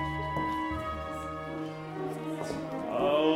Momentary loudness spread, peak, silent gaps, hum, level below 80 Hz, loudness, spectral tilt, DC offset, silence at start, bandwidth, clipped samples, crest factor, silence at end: 8 LU; -14 dBFS; none; none; -50 dBFS; -34 LUFS; -6.5 dB/octave; under 0.1%; 0 s; 15.5 kHz; under 0.1%; 18 dB; 0 s